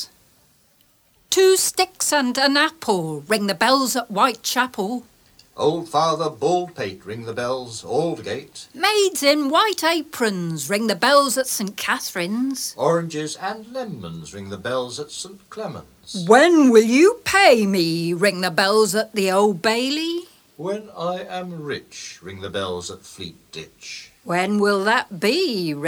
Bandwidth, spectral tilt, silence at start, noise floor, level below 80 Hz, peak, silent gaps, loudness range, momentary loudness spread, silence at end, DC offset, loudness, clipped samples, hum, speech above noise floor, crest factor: 18.5 kHz; -3.5 dB/octave; 0 s; -59 dBFS; -62 dBFS; 0 dBFS; none; 11 LU; 18 LU; 0 s; under 0.1%; -19 LUFS; under 0.1%; none; 39 dB; 20 dB